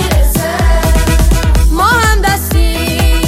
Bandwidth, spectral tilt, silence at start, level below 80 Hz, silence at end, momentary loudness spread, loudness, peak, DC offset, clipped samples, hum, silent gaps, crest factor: 16 kHz; -4.5 dB/octave; 0 s; -12 dBFS; 0 s; 3 LU; -11 LUFS; 0 dBFS; under 0.1%; under 0.1%; none; none; 10 dB